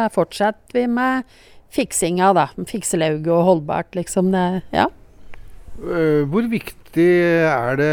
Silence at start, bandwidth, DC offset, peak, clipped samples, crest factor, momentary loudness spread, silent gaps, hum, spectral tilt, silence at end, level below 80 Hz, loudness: 0 s; 19.5 kHz; under 0.1%; -2 dBFS; under 0.1%; 16 dB; 9 LU; none; none; -5.5 dB/octave; 0 s; -46 dBFS; -19 LUFS